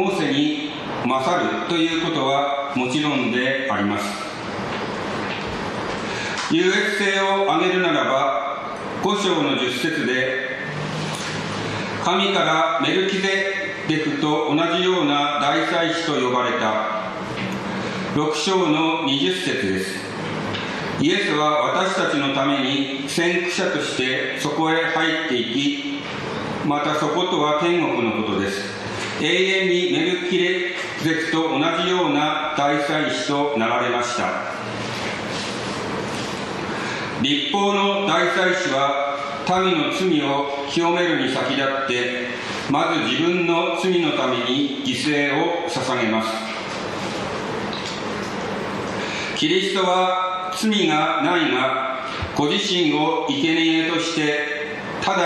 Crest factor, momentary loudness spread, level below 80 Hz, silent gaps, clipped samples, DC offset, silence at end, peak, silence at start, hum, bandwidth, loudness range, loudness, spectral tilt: 16 dB; 8 LU; -54 dBFS; none; under 0.1%; under 0.1%; 0 s; -6 dBFS; 0 s; none; 13 kHz; 3 LU; -21 LUFS; -4 dB/octave